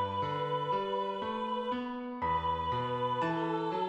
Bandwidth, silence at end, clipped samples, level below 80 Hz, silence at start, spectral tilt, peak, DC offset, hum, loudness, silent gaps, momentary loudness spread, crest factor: 9 kHz; 0 s; under 0.1%; -58 dBFS; 0 s; -7 dB/octave; -22 dBFS; under 0.1%; none; -34 LUFS; none; 4 LU; 12 dB